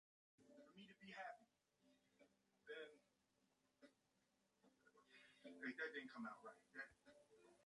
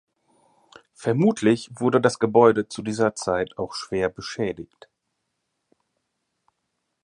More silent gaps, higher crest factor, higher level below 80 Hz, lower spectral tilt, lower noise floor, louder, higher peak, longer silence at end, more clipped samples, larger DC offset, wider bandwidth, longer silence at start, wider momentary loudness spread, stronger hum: neither; about the same, 24 dB vs 22 dB; second, under -90 dBFS vs -58 dBFS; second, -4.5 dB/octave vs -6 dB/octave; first, -86 dBFS vs -78 dBFS; second, -57 LUFS vs -22 LUFS; second, -38 dBFS vs -2 dBFS; second, 0 s vs 2.4 s; neither; neither; about the same, 11 kHz vs 11 kHz; second, 0.4 s vs 1 s; first, 15 LU vs 12 LU; neither